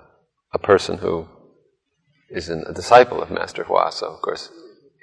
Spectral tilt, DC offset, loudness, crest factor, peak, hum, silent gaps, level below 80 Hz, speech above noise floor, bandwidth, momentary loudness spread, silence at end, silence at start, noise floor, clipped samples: -4.5 dB/octave; under 0.1%; -20 LUFS; 20 dB; 0 dBFS; none; none; -54 dBFS; 48 dB; 11 kHz; 18 LU; 0.35 s; 0.55 s; -67 dBFS; under 0.1%